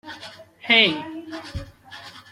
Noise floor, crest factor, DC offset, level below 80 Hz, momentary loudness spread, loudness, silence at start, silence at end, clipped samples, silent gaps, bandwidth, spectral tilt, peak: -43 dBFS; 22 dB; under 0.1%; -50 dBFS; 25 LU; -17 LUFS; 0.05 s; 0.1 s; under 0.1%; none; 16 kHz; -4 dB/octave; -4 dBFS